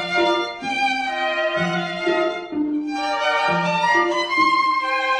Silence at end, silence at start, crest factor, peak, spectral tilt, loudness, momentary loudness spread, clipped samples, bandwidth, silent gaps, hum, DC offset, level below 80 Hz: 0 s; 0 s; 14 dB; -6 dBFS; -4.5 dB/octave; -20 LUFS; 6 LU; under 0.1%; 10 kHz; none; none; under 0.1%; -60 dBFS